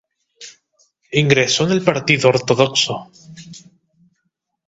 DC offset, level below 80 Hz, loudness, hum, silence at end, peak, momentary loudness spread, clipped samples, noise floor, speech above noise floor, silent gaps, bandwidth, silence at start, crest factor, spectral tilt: under 0.1%; -56 dBFS; -15 LUFS; none; 1.1 s; 0 dBFS; 24 LU; under 0.1%; -72 dBFS; 56 dB; none; 8.2 kHz; 0.4 s; 20 dB; -4 dB/octave